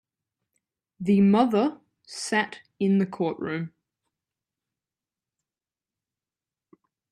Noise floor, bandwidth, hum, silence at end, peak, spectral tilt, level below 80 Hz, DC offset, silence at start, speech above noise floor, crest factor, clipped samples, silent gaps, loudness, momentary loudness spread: under -90 dBFS; 11 kHz; none; 3.45 s; -8 dBFS; -6.5 dB/octave; -70 dBFS; under 0.1%; 1 s; over 67 dB; 20 dB; under 0.1%; none; -25 LUFS; 14 LU